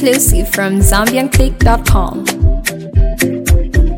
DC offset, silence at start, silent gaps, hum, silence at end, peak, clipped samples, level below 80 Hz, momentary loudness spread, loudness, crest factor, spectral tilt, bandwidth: under 0.1%; 0 s; none; none; 0 s; 0 dBFS; under 0.1%; -14 dBFS; 5 LU; -13 LUFS; 10 dB; -4.5 dB/octave; 17 kHz